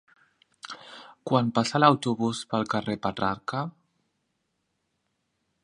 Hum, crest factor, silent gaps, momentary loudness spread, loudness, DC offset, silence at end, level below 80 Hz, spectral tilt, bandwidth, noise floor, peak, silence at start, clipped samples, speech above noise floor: none; 26 dB; none; 21 LU; -26 LUFS; under 0.1%; 1.95 s; -62 dBFS; -5.5 dB/octave; 11 kHz; -77 dBFS; -2 dBFS; 0.65 s; under 0.1%; 52 dB